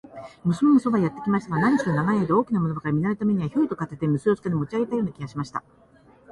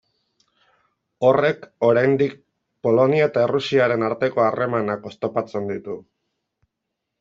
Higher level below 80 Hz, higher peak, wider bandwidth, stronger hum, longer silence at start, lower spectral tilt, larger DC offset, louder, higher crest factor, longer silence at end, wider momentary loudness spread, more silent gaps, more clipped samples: first, -58 dBFS vs -64 dBFS; second, -8 dBFS vs -4 dBFS; first, 11.5 kHz vs 7.6 kHz; neither; second, 0.05 s vs 1.2 s; first, -8.5 dB/octave vs -7 dB/octave; neither; second, -24 LUFS vs -20 LUFS; about the same, 16 dB vs 18 dB; second, 0.75 s vs 1.2 s; about the same, 11 LU vs 10 LU; neither; neither